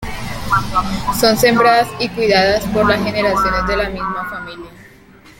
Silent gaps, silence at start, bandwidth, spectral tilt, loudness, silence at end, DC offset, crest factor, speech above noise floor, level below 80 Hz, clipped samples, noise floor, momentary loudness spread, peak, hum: none; 0 s; 17 kHz; -4.5 dB/octave; -15 LUFS; 0.1 s; under 0.1%; 16 dB; 28 dB; -34 dBFS; under 0.1%; -43 dBFS; 14 LU; 0 dBFS; none